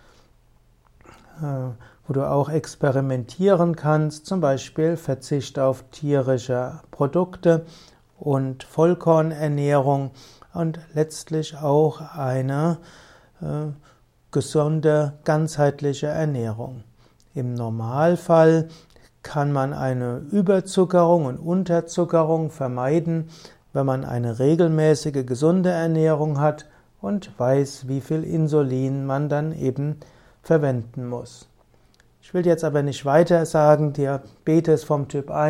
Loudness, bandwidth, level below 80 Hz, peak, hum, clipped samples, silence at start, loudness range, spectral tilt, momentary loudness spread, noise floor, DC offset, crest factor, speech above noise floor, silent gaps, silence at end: -22 LUFS; 13 kHz; -56 dBFS; -2 dBFS; none; under 0.1%; 1.35 s; 4 LU; -7.5 dB/octave; 12 LU; -57 dBFS; under 0.1%; 18 dB; 36 dB; none; 0 s